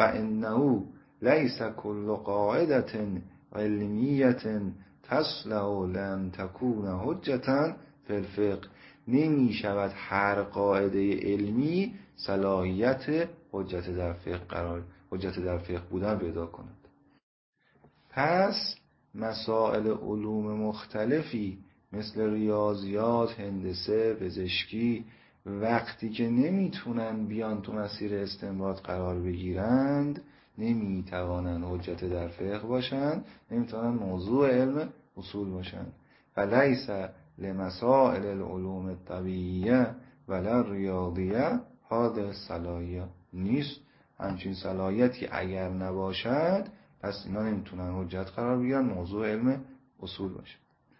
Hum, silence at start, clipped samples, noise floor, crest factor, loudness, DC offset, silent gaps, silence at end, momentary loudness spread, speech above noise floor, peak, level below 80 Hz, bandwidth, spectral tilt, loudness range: none; 0 s; under 0.1%; -63 dBFS; 24 dB; -30 LUFS; under 0.1%; 17.23-17.53 s; 0.45 s; 12 LU; 34 dB; -6 dBFS; -50 dBFS; 5.8 kHz; -10.5 dB/octave; 4 LU